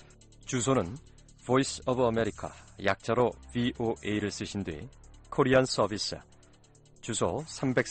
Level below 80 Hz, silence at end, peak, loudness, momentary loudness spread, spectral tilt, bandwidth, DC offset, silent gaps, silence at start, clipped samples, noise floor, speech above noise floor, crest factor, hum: -54 dBFS; 0 s; -12 dBFS; -30 LUFS; 17 LU; -5 dB/octave; 9 kHz; under 0.1%; none; 0.45 s; under 0.1%; -58 dBFS; 29 dB; 20 dB; none